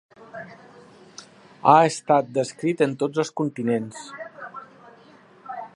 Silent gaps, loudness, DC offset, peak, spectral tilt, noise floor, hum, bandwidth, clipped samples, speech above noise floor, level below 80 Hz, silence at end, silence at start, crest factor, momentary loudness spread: none; -22 LUFS; under 0.1%; -2 dBFS; -5.5 dB/octave; -51 dBFS; none; 11.5 kHz; under 0.1%; 30 dB; -74 dBFS; 0.1 s; 0.2 s; 24 dB; 25 LU